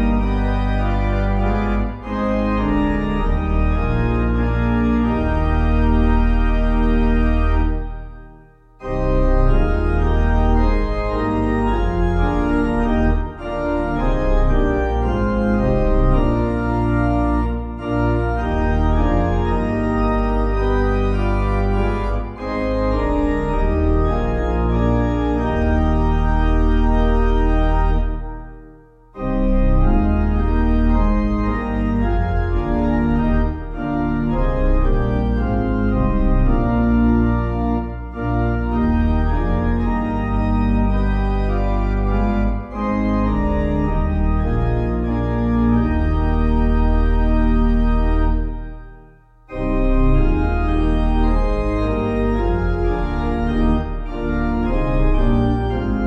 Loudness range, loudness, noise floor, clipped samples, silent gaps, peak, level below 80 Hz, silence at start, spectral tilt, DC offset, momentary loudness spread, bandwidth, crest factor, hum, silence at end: 2 LU; -20 LUFS; -46 dBFS; under 0.1%; none; -4 dBFS; -20 dBFS; 0 s; -9.5 dB/octave; under 0.1%; 4 LU; 5.2 kHz; 12 dB; none; 0 s